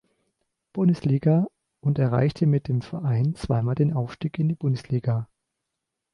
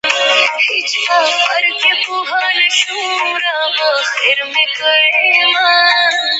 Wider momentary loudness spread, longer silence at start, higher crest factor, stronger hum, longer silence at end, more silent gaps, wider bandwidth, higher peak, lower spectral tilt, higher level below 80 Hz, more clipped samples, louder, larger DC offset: about the same, 8 LU vs 6 LU; first, 0.75 s vs 0.05 s; about the same, 14 dB vs 14 dB; neither; first, 0.9 s vs 0 s; neither; first, 10.5 kHz vs 8.8 kHz; second, -10 dBFS vs 0 dBFS; first, -9.5 dB/octave vs 1.5 dB/octave; first, -52 dBFS vs -70 dBFS; neither; second, -24 LUFS vs -11 LUFS; neither